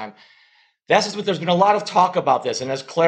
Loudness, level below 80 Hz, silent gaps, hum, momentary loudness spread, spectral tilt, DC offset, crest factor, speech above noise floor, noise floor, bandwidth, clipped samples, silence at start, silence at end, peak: -19 LUFS; -68 dBFS; none; none; 8 LU; -4.5 dB/octave; under 0.1%; 18 dB; 38 dB; -58 dBFS; 10 kHz; under 0.1%; 0 s; 0 s; -2 dBFS